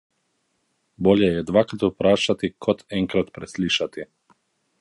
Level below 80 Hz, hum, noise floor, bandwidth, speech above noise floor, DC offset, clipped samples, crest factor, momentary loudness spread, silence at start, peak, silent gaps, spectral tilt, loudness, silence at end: -52 dBFS; none; -71 dBFS; 11.5 kHz; 50 dB; under 0.1%; under 0.1%; 20 dB; 11 LU; 1 s; -2 dBFS; none; -5.5 dB/octave; -22 LUFS; 0.75 s